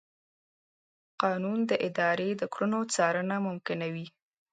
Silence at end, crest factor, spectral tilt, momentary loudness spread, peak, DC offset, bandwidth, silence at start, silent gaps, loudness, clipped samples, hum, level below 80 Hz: 0.45 s; 22 dB; -5 dB/octave; 7 LU; -10 dBFS; under 0.1%; 9.4 kHz; 1.2 s; none; -30 LUFS; under 0.1%; none; -80 dBFS